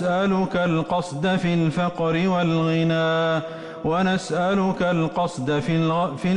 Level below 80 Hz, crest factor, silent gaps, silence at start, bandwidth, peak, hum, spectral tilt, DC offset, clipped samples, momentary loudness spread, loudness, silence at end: -52 dBFS; 10 dB; none; 0 s; 10.5 kHz; -12 dBFS; none; -6.5 dB/octave; under 0.1%; under 0.1%; 4 LU; -22 LUFS; 0 s